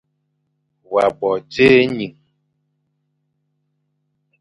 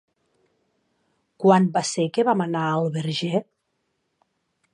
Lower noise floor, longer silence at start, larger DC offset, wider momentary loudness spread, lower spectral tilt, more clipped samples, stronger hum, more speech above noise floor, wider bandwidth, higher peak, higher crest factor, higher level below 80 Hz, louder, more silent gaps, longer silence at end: second, -70 dBFS vs -74 dBFS; second, 0.9 s vs 1.4 s; neither; first, 13 LU vs 8 LU; about the same, -6.5 dB/octave vs -5.5 dB/octave; neither; first, 50 Hz at -50 dBFS vs none; about the same, 55 dB vs 53 dB; about the same, 10.5 kHz vs 11 kHz; first, 0 dBFS vs -4 dBFS; about the same, 20 dB vs 20 dB; first, -54 dBFS vs -74 dBFS; first, -16 LUFS vs -22 LUFS; neither; first, 2.3 s vs 1.3 s